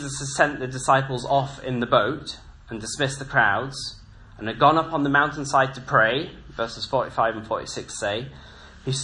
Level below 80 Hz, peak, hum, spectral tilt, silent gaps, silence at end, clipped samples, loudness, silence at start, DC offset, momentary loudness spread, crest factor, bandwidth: -50 dBFS; -2 dBFS; none; -4 dB/octave; none; 0 s; under 0.1%; -23 LUFS; 0 s; under 0.1%; 15 LU; 22 dB; 11 kHz